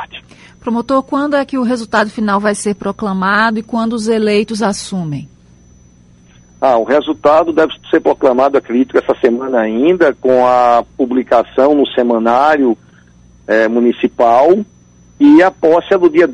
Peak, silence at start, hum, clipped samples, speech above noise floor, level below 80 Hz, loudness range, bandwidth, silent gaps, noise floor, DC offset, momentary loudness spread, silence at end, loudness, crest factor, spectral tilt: 0 dBFS; 0 s; 60 Hz at -45 dBFS; under 0.1%; 33 dB; -48 dBFS; 5 LU; 11.5 kHz; none; -44 dBFS; under 0.1%; 9 LU; 0 s; -12 LUFS; 12 dB; -5.5 dB/octave